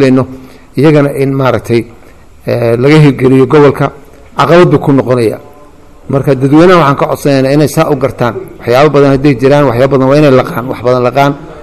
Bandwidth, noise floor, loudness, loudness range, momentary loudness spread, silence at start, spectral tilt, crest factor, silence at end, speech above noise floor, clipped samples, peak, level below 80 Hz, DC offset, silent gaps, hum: 14 kHz; -36 dBFS; -8 LUFS; 1 LU; 10 LU; 0 s; -7.5 dB/octave; 8 dB; 0 s; 30 dB; 6%; 0 dBFS; -36 dBFS; 1%; none; none